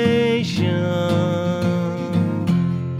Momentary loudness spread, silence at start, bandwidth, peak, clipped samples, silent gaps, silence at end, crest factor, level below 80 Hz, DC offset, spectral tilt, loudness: 3 LU; 0 s; 11 kHz; -6 dBFS; under 0.1%; none; 0 s; 12 dB; -52 dBFS; under 0.1%; -7 dB/octave; -20 LUFS